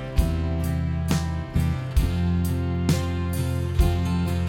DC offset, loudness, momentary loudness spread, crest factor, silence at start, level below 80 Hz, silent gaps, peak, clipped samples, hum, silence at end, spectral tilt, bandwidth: under 0.1%; -25 LUFS; 3 LU; 16 dB; 0 s; -28 dBFS; none; -6 dBFS; under 0.1%; none; 0 s; -6.5 dB/octave; 17 kHz